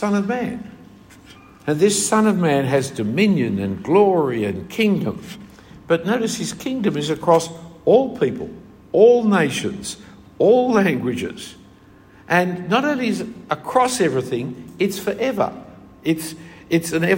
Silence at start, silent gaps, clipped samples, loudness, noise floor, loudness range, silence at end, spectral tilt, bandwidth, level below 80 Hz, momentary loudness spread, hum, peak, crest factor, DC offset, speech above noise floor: 0 s; none; under 0.1%; -19 LUFS; -47 dBFS; 4 LU; 0 s; -5 dB/octave; 16.5 kHz; -56 dBFS; 16 LU; none; -2 dBFS; 18 dB; under 0.1%; 29 dB